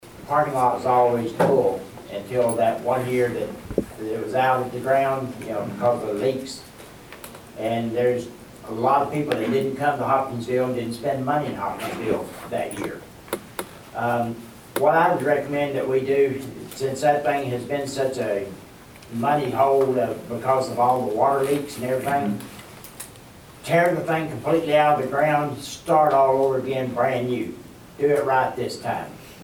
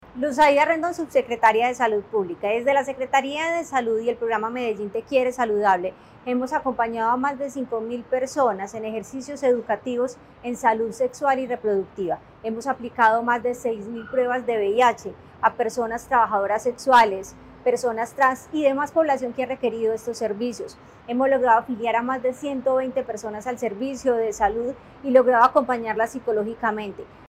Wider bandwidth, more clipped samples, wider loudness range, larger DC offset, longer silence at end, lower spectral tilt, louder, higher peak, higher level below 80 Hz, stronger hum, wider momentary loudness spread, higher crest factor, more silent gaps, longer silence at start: first, over 20 kHz vs 15 kHz; neither; about the same, 5 LU vs 4 LU; neither; about the same, 0 s vs 0.05 s; first, -6 dB/octave vs -4.5 dB/octave; about the same, -23 LUFS vs -23 LUFS; about the same, -6 dBFS vs -4 dBFS; about the same, -56 dBFS vs -58 dBFS; neither; first, 16 LU vs 11 LU; about the same, 18 dB vs 18 dB; neither; about the same, 0.05 s vs 0.15 s